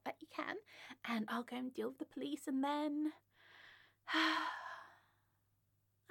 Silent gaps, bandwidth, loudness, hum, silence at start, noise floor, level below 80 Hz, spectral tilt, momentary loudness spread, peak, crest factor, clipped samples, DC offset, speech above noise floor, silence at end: none; 17.5 kHz; -41 LUFS; none; 0.05 s; -80 dBFS; under -90 dBFS; -3.5 dB/octave; 20 LU; -22 dBFS; 22 dB; under 0.1%; under 0.1%; 40 dB; 1.15 s